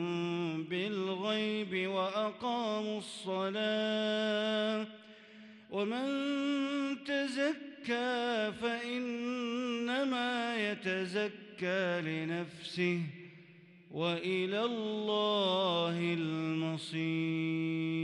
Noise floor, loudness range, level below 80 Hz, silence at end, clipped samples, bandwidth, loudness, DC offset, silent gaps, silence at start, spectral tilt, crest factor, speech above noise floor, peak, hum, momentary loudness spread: -58 dBFS; 3 LU; -80 dBFS; 0 s; under 0.1%; 11.5 kHz; -34 LUFS; under 0.1%; none; 0 s; -5.5 dB/octave; 14 dB; 24 dB; -20 dBFS; none; 7 LU